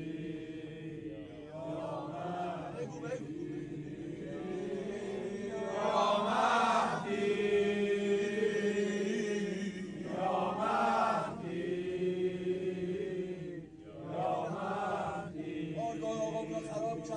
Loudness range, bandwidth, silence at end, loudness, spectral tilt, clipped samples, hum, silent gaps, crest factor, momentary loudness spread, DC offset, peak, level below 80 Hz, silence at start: 9 LU; 10 kHz; 0 s; -35 LUFS; -5.5 dB/octave; under 0.1%; none; none; 18 dB; 13 LU; under 0.1%; -18 dBFS; -66 dBFS; 0 s